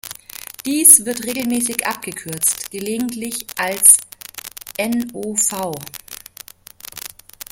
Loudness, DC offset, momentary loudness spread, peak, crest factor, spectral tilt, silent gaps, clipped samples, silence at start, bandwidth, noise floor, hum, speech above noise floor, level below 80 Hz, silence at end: -15 LUFS; under 0.1%; 24 LU; 0 dBFS; 20 dB; -1.5 dB/octave; none; 0.1%; 0.05 s; 17 kHz; -41 dBFS; none; 23 dB; -58 dBFS; 0.45 s